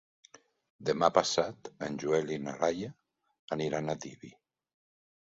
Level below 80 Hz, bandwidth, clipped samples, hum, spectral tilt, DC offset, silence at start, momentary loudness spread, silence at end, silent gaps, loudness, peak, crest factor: -68 dBFS; 7.8 kHz; under 0.1%; none; -4.5 dB/octave; under 0.1%; 0.8 s; 14 LU; 1.1 s; 3.39-3.48 s; -32 LUFS; -10 dBFS; 24 dB